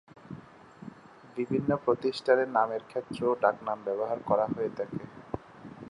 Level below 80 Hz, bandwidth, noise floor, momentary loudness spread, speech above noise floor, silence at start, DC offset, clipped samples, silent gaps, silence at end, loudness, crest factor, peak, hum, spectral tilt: -64 dBFS; 11 kHz; -50 dBFS; 21 LU; 21 dB; 0.25 s; under 0.1%; under 0.1%; none; 0 s; -29 LUFS; 22 dB; -10 dBFS; none; -7 dB/octave